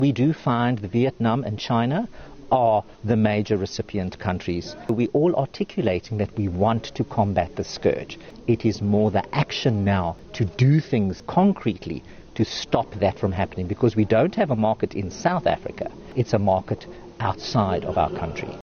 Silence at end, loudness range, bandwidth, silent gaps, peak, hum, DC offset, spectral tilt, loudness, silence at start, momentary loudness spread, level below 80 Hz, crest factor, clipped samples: 0 s; 2 LU; 6.8 kHz; none; -4 dBFS; none; under 0.1%; -7 dB/octave; -23 LUFS; 0 s; 9 LU; -50 dBFS; 18 dB; under 0.1%